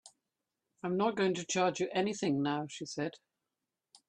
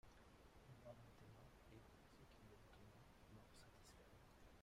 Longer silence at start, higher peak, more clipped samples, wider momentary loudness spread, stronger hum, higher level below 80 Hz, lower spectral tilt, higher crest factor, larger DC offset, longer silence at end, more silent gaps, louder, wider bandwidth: about the same, 0.05 s vs 0.05 s; first, -18 dBFS vs -48 dBFS; neither; first, 9 LU vs 5 LU; neither; about the same, -76 dBFS vs -74 dBFS; about the same, -4.5 dB/octave vs -5 dB/octave; about the same, 18 dB vs 18 dB; neither; first, 0.95 s vs 0 s; neither; first, -34 LUFS vs -67 LUFS; second, 10 kHz vs 15.5 kHz